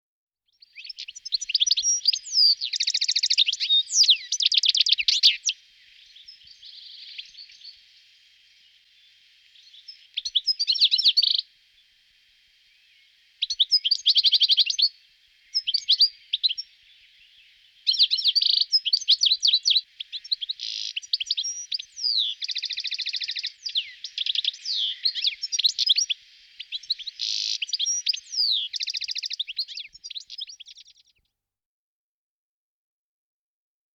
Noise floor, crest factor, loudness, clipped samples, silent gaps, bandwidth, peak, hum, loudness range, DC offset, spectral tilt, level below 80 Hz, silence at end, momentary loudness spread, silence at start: -85 dBFS; 18 dB; -21 LUFS; under 0.1%; none; 20 kHz; -8 dBFS; none; 9 LU; under 0.1%; 8 dB/octave; -78 dBFS; 3.25 s; 18 LU; 0.75 s